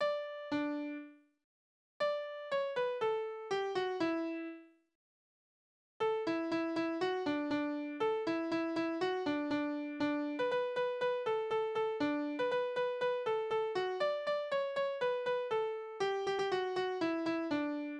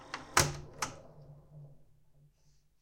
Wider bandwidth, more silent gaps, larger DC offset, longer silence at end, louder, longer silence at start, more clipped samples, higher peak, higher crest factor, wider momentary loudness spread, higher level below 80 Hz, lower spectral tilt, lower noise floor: second, 9.8 kHz vs 16 kHz; first, 1.44-2.00 s, 4.95-6.00 s vs none; neither; second, 0 s vs 1 s; second, -36 LUFS vs -33 LUFS; about the same, 0 s vs 0 s; neither; second, -22 dBFS vs -8 dBFS; second, 14 dB vs 30 dB; second, 4 LU vs 26 LU; second, -78 dBFS vs -58 dBFS; first, -5 dB/octave vs -2.5 dB/octave; first, under -90 dBFS vs -67 dBFS